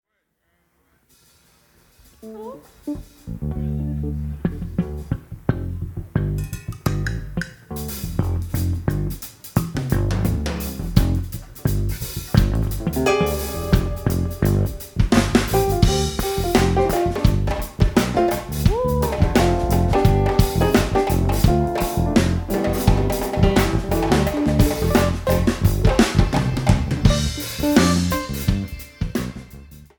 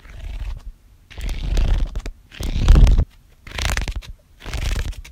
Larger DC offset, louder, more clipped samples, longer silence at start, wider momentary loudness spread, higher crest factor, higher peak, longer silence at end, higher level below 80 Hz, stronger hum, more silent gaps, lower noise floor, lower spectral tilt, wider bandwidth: neither; about the same, -21 LUFS vs -23 LUFS; neither; first, 2.25 s vs 0.1 s; second, 12 LU vs 21 LU; about the same, 20 dB vs 20 dB; about the same, 0 dBFS vs 0 dBFS; first, 0.15 s vs 0 s; second, -26 dBFS vs -20 dBFS; neither; neither; first, -71 dBFS vs -43 dBFS; about the same, -6 dB/octave vs -5 dB/octave; first, 19 kHz vs 14.5 kHz